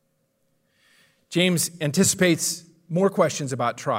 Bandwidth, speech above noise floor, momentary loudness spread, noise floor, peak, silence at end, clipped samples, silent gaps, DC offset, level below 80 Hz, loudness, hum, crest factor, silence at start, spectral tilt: 16 kHz; 48 dB; 8 LU; -70 dBFS; -6 dBFS; 0 s; under 0.1%; none; under 0.1%; -64 dBFS; -22 LUFS; none; 18 dB; 1.3 s; -4 dB/octave